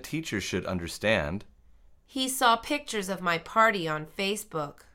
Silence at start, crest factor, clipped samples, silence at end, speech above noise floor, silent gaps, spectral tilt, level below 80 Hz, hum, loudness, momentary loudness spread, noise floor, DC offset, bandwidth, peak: 0 s; 22 dB; under 0.1%; 0.2 s; 27 dB; none; -3.5 dB/octave; -54 dBFS; none; -28 LUFS; 12 LU; -56 dBFS; under 0.1%; 17 kHz; -8 dBFS